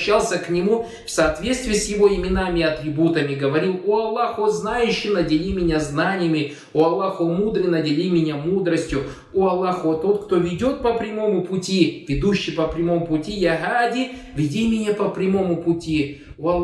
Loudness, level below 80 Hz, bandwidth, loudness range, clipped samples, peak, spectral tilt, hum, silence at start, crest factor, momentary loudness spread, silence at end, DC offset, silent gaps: -21 LUFS; -40 dBFS; 12 kHz; 1 LU; under 0.1%; -4 dBFS; -5.5 dB/octave; none; 0 s; 16 dB; 4 LU; 0 s; under 0.1%; none